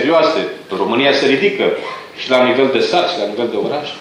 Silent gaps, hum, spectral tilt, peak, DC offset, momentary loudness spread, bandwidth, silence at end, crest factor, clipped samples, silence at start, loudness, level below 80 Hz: none; none; -4.5 dB/octave; 0 dBFS; under 0.1%; 9 LU; 11 kHz; 0 s; 14 dB; under 0.1%; 0 s; -15 LUFS; -64 dBFS